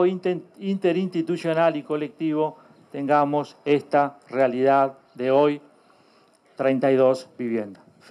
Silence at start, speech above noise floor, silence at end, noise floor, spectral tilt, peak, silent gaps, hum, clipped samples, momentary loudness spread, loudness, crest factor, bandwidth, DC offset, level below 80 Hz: 0 s; 36 dB; 0.35 s; -58 dBFS; -7.5 dB/octave; -8 dBFS; none; none; under 0.1%; 10 LU; -23 LUFS; 16 dB; 11 kHz; under 0.1%; -84 dBFS